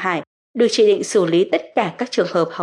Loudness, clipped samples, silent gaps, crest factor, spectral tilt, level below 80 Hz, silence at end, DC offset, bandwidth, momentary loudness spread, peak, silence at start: -18 LUFS; under 0.1%; 0.27-0.54 s; 14 dB; -4.5 dB/octave; -76 dBFS; 0 s; under 0.1%; 11.5 kHz; 8 LU; -4 dBFS; 0 s